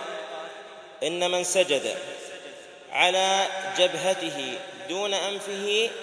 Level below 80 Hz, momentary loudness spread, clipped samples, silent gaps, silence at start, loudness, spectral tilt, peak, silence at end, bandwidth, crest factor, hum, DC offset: -82 dBFS; 18 LU; under 0.1%; none; 0 s; -25 LUFS; -1.5 dB/octave; -6 dBFS; 0 s; 11 kHz; 20 dB; none; under 0.1%